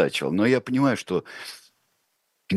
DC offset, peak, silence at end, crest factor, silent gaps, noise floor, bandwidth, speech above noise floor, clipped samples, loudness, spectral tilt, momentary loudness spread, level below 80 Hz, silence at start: under 0.1%; -6 dBFS; 0 s; 20 dB; none; -73 dBFS; 12.5 kHz; 49 dB; under 0.1%; -23 LUFS; -6 dB/octave; 17 LU; -66 dBFS; 0 s